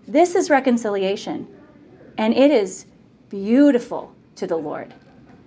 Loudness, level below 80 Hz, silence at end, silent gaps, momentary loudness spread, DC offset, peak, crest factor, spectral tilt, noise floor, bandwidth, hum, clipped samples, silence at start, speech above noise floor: -19 LUFS; -64 dBFS; 0.6 s; none; 19 LU; under 0.1%; -4 dBFS; 18 dB; -5 dB/octave; -46 dBFS; 8 kHz; none; under 0.1%; 0.05 s; 28 dB